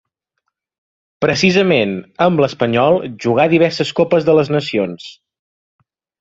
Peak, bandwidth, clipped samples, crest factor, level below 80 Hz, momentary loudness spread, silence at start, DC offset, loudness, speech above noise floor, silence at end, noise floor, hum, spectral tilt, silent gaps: 0 dBFS; 7.8 kHz; under 0.1%; 16 dB; -54 dBFS; 8 LU; 1.2 s; under 0.1%; -15 LUFS; 60 dB; 1.1 s; -74 dBFS; none; -6 dB/octave; none